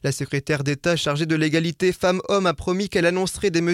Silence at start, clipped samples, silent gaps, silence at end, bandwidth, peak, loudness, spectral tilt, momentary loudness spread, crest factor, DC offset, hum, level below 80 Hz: 0.05 s; under 0.1%; none; 0 s; 16 kHz; -6 dBFS; -22 LUFS; -5 dB/octave; 4 LU; 14 dB; under 0.1%; none; -48 dBFS